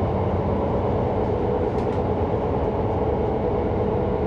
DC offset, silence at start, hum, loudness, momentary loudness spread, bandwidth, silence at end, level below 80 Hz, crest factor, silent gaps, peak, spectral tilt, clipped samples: under 0.1%; 0 s; none; -23 LUFS; 1 LU; 6.8 kHz; 0 s; -34 dBFS; 12 dB; none; -10 dBFS; -10 dB/octave; under 0.1%